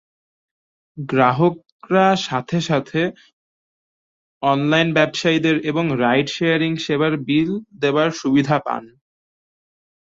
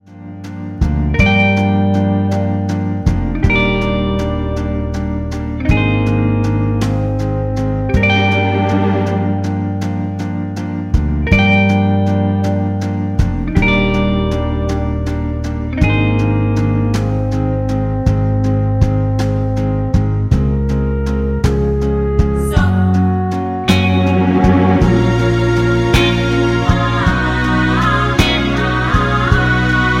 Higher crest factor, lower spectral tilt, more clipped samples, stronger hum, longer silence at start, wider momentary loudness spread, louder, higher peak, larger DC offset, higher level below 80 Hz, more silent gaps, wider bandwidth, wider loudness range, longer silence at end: about the same, 18 dB vs 14 dB; about the same, -6 dB/octave vs -7 dB/octave; neither; neither; first, 0.95 s vs 0.1 s; about the same, 7 LU vs 7 LU; second, -19 LUFS vs -15 LUFS; about the same, -2 dBFS vs 0 dBFS; neither; second, -60 dBFS vs -22 dBFS; first, 1.72-1.79 s, 3.33-4.41 s vs none; second, 7.8 kHz vs 12.5 kHz; about the same, 3 LU vs 3 LU; first, 1.25 s vs 0 s